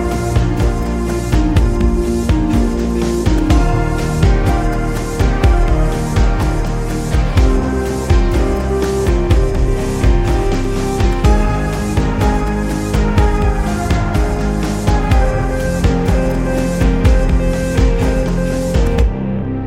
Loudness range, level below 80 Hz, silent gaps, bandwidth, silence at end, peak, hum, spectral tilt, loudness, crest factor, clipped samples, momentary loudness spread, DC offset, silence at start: 1 LU; -16 dBFS; none; 14 kHz; 0 s; 0 dBFS; none; -6.5 dB/octave; -16 LUFS; 12 dB; under 0.1%; 4 LU; under 0.1%; 0 s